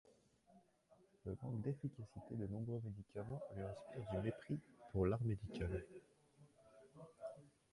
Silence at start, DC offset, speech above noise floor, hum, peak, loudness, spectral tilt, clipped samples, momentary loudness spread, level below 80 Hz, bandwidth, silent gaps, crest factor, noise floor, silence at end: 0.05 s; under 0.1%; 28 dB; none; -26 dBFS; -47 LUFS; -9 dB/octave; under 0.1%; 15 LU; -62 dBFS; 11.5 kHz; none; 20 dB; -73 dBFS; 0.25 s